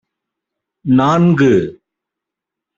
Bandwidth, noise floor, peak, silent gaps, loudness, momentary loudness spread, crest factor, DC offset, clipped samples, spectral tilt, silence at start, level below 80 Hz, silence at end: 7.6 kHz; -83 dBFS; 0 dBFS; none; -13 LUFS; 15 LU; 16 dB; under 0.1%; under 0.1%; -8 dB/octave; 0.85 s; -52 dBFS; 1.05 s